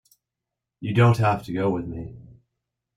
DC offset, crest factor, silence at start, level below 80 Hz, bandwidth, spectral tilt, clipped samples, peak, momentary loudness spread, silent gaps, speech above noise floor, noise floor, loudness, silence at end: under 0.1%; 18 dB; 0.8 s; -52 dBFS; 12 kHz; -8 dB/octave; under 0.1%; -6 dBFS; 18 LU; none; 64 dB; -85 dBFS; -22 LUFS; 0.75 s